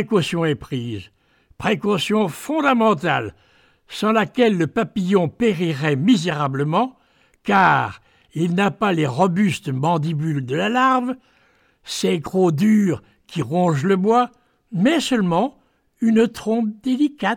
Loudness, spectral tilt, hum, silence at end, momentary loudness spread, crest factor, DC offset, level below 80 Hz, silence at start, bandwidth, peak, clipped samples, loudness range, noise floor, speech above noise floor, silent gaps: -20 LUFS; -6 dB/octave; none; 0 s; 11 LU; 16 dB; under 0.1%; -56 dBFS; 0 s; 16.5 kHz; -4 dBFS; under 0.1%; 2 LU; -59 dBFS; 40 dB; none